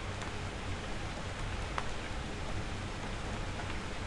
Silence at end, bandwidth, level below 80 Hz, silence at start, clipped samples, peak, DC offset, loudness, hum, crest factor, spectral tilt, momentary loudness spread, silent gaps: 0 s; 11.5 kHz; -44 dBFS; 0 s; under 0.1%; -16 dBFS; under 0.1%; -40 LUFS; none; 22 dB; -4.5 dB/octave; 2 LU; none